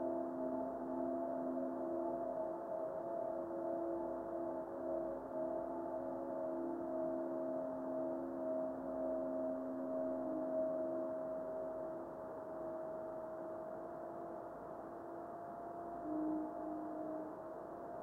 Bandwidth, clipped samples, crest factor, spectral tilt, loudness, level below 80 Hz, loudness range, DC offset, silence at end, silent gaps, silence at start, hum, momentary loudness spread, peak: 3.1 kHz; under 0.1%; 14 dB; -9 dB/octave; -43 LUFS; -74 dBFS; 6 LU; under 0.1%; 0 s; none; 0 s; none; 7 LU; -30 dBFS